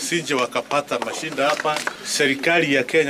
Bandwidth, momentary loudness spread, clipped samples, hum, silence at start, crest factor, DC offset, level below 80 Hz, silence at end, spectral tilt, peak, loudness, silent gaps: 16 kHz; 8 LU; under 0.1%; none; 0 s; 14 dB; under 0.1%; -64 dBFS; 0 s; -3 dB/octave; -8 dBFS; -21 LUFS; none